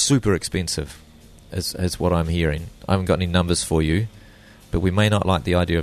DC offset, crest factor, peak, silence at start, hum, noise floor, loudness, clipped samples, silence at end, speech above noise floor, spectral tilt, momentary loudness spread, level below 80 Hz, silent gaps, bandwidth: under 0.1%; 18 dB; -4 dBFS; 0 s; none; -47 dBFS; -22 LUFS; under 0.1%; 0 s; 26 dB; -5 dB/octave; 9 LU; -36 dBFS; none; 13.5 kHz